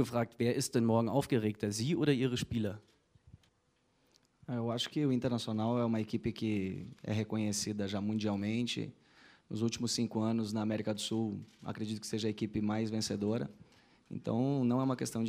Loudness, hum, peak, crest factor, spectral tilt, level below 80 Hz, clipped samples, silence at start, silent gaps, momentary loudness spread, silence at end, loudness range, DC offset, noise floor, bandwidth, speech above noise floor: -35 LUFS; none; -16 dBFS; 18 dB; -5.5 dB/octave; -66 dBFS; under 0.1%; 0 s; none; 9 LU; 0 s; 3 LU; under 0.1%; -75 dBFS; 15.5 kHz; 41 dB